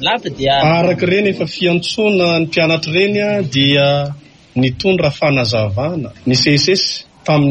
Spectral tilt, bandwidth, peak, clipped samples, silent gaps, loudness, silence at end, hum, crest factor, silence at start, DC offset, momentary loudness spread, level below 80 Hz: -5 dB/octave; 10 kHz; -2 dBFS; under 0.1%; none; -14 LUFS; 0 s; none; 12 dB; 0 s; under 0.1%; 7 LU; -44 dBFS